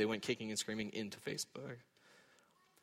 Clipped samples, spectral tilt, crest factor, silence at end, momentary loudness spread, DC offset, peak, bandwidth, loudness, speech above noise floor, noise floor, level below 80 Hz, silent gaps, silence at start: under 0.1%; -3.5 dB/octave; 20 dB; 0.65 s; 12 LU; under 0.1%; -22 dBFS; 16 kHz; -42 LUFS; 29 dB; -71 dBFS; -78 dBFS; none; 0 s